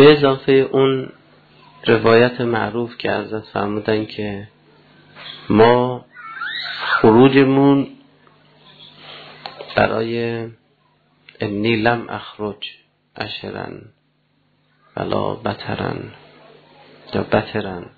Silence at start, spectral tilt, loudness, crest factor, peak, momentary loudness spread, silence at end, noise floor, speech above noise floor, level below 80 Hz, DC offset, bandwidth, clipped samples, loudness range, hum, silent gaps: 0 s; -9 dB/octave; -18 LUFS; 18 dB; 0 dBFS; 21 LU; 0.1 s; -62 dBFS; 46 dB; -52 dBFS; under 0.1%; 4.8 kHz; under 0.1%; 12 LU; none; none